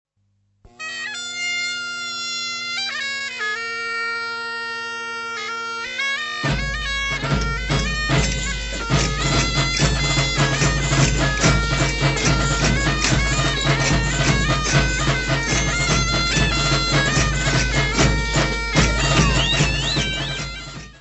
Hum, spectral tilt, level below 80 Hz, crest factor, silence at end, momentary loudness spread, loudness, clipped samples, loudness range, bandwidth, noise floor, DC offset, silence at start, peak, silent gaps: 50 Hz at -50 dBFS; -3.5 dB/octave; -28 dBFS; 18 dB; 0.05 s; 9 LU; -20 LUFS; under 0.1%; 6 LU; 8.4 kHz; -66 dBFS; under 0.1%; 0.8 s; -2 dBFS; none